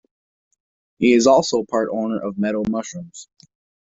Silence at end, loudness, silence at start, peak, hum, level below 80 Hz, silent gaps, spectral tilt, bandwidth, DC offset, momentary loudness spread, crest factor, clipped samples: 0.7 s; -19 LUFS; 1 s; -2 dBFS; none; -58 dBFS; none; -4.5 dB/octave; 8 kHz; under 0.1%; 20 LU; 18 dB; under 0.1%